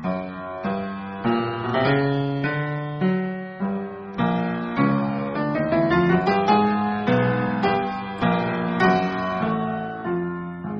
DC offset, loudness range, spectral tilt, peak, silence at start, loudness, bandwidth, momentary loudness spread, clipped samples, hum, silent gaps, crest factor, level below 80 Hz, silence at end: under 0.1%; 3 LU; -5.5 dB/octave; -4 dBFS; 0 s; -23 LUFS; 6.4 kHz; 9 LU; under 0.1%; none; none; 18 dB; -52 dBFS; 0 s